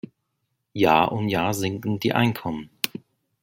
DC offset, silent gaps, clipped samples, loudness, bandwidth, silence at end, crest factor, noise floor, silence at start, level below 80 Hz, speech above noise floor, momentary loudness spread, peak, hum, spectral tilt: under 0.1%; none; under 0.1%; -23 LUFS; 17 kHz; 0.55 s; 24 dB; -76 dBFS; 0.75 s; -58 dBFS; 54 dB; 15 LU; 0 dBFS; none; -5.5 dB/octave